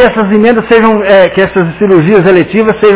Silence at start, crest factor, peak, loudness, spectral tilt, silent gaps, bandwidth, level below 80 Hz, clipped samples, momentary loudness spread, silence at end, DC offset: 0 s; 6 dB; 0 dBFS; -7 LUFS; -10.5 dB/octave; none; 4 kHz; -38 dBFS; 3%; 4 LU; 0 s; under 0.1%